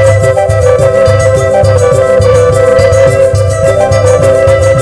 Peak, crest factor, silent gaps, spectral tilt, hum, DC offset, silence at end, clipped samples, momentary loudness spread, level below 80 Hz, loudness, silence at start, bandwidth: 0 dBFS; 6 dB; none; -6 dB/octave; none; under 0.1%; 0 s; 3%; 2 LU; -24 dBFS; -7 LUFS; 0 s; 11 kHz